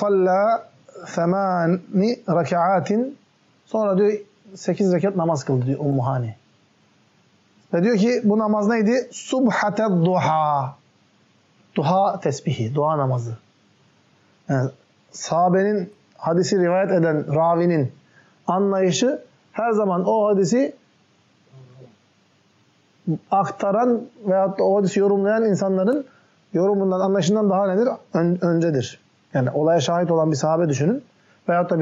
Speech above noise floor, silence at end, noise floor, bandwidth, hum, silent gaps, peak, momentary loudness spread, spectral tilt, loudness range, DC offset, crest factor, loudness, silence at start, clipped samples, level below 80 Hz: 40 dB; 0 s; -60 dBFS; 8 kHz; none; none; -8 dBFS; 10 LU; -6.5 dB/octave; 4 LU; under 0.1%; 12 dB; -21 LUFS; 0 s; under 0.1%; -70 dBFS